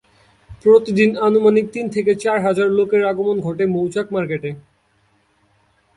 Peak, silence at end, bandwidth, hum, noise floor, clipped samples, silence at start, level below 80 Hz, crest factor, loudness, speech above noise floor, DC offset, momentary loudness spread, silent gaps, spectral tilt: -2 dBFS; 1.35 s; 11.5 kHz; none; -60 dBFS; under 0.1%; 0.5 s; -56 dBFS; 16 dB; -17 LUFS; 44 dB; under 0.1%; 9 LU; none; -7 dB/octave